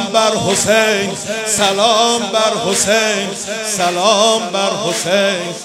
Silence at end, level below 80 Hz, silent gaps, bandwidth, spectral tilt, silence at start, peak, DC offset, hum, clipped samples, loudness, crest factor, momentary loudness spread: 0 s; -54 dBFS; none; 16.5 kHz; -2 dB/octave; 0 s; 0 dBFS; under 0.1%; none; under 0.1%; -14 LUFS; 14 dB; 7 LU